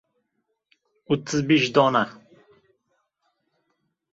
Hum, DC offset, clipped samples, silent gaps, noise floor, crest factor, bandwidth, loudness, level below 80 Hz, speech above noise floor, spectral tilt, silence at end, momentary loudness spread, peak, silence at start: none; under 0.1%; under 0.1%; none; -76 dBFS; 22 dB; 7.8 kHz; -22 LUFS; -64 dBFS; 55 dB; -5 dB/octave; 2 s; 9 LU; -4 dBFS; 1.1 s